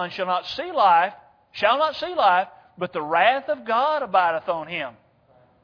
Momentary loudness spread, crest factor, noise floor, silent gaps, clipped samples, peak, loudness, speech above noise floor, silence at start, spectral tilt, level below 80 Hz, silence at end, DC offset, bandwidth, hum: 12 LU; 18 dB; -58 dBFS; none; under 0.1%; -4 dBFS; -22 LUFS; 36 dB; 0 s; -5 dB/octave; -66 dBFS; 0.75 s; under 0.1%; 5.4 kHz; none